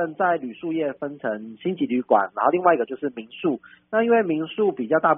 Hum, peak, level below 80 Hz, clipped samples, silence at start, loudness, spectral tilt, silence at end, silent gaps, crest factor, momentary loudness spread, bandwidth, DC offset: none; -4 dBFS; -68 dBFS; under 0.1%; 0 s; -23 LUFS; -1.5 dB/octave; 0 s; none; 18 dB; 10 LU; 3.7 kHz; under 0.1%